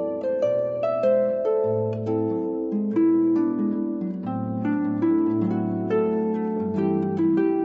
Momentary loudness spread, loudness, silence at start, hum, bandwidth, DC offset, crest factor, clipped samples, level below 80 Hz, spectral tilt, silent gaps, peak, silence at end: 6 LU; -24 LUFS; 0 s; none; 4.5 kHz; under 0.1%; 12 dB; under 0.1%; -66 dBFS; -10.5 dB/octave; none; -12 dBFS; 0 s